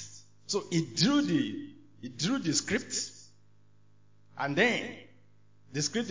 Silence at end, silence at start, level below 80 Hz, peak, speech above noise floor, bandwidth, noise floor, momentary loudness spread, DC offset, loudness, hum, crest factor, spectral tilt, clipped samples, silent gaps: 0 s; 0 s; -68 dBFS; -12 dBFS; 35 dB; 7.8 kHz; -65 dBFS; 20 LU; 0.1%; -30 LUFS; none; 20 dB; -3.5 dB/octave; under 0.1%; none